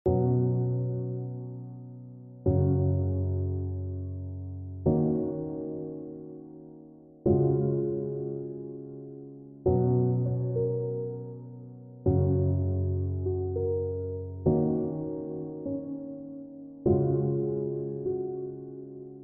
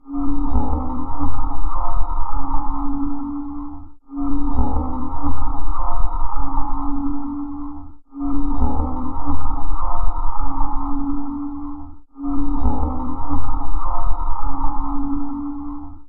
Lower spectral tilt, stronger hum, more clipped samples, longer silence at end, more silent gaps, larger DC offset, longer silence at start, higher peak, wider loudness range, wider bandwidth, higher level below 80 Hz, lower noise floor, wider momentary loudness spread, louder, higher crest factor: about the same, -13.5 dB/octave vs -12.5 dB/octave; neither; neither; about the same, 0 s vs 0.05 s; neither; neither; about the same, 0.05 s vs 0.1 s; second, -12 dBFS vs -2 dBFS; about the same, 3 LU vs 2 LU; about the same, 1.6 kHz vs 1.5 kHz; second, -50 dBFS vs -22 dBFS; first, -51 dBFS vs -32 dBFS; first, 18 LU vs 8 LU; second, -30 LUFS vs -26 LUFS; first, 16 dB vs 10 dB